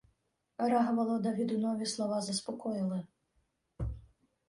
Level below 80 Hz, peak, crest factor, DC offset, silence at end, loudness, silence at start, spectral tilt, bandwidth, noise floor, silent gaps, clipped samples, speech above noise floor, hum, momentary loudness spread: -54 dBFS; -18 dBFS; 16 dB; under 0.1%; 0.45 s; -34 LUFS; 0.6 s; -5.5 dB/octave; 11.5 kHz; -77 dBFS; none; under 0.1%; 45 dB; none; 12 LU